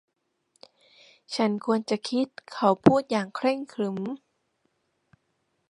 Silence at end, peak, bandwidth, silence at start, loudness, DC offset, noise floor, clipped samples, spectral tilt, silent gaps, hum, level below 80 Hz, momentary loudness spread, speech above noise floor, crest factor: 1.55 s; -2 dBFS; 11.5 kHz; 1.3 s; -26 LUFS; under 0.1%; -75 dBFS; under 0.1%; -6 dB/octave; none; none; -66 dBFS; 13 LU; 49 dB; 26 dB